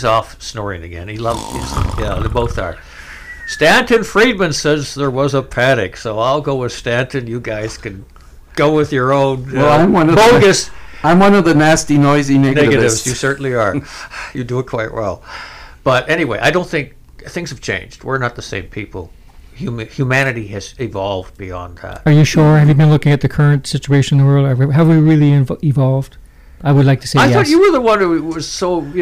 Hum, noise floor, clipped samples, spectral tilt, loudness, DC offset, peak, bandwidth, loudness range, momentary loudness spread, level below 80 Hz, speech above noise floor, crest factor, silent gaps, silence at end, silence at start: none; -32 dBFS; under 0.1%; -6 dB/octave; -13 LUFS; under 0.1%; -4 dBFS; 15 kHz; 9 LU; 17 LU; -34 dBFS; 19 dB; 10 dB; none; 0 s; 0 s